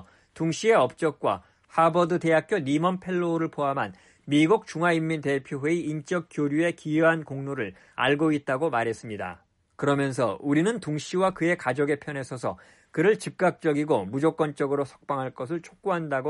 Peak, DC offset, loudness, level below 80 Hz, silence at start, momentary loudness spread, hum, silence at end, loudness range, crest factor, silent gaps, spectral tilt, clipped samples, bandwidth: -10 dBFS; under 0.1%; -26 LUFS; -66 dBFS; 0.35 s; 11 LU; none; 0 s; 2 LU; 16 dB; none; -6 dB/octave; under 0.1%; 11.5 kHz